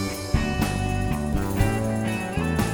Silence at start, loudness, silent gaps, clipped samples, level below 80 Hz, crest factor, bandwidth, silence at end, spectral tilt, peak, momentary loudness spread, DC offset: 0 s; -25 LUFS; none; under 0.1%; -32 dBFS; 16 dB; over 20 kHz; 0 s; -6 dB/octave; -8 dBFS; 3 LU; under 0.1%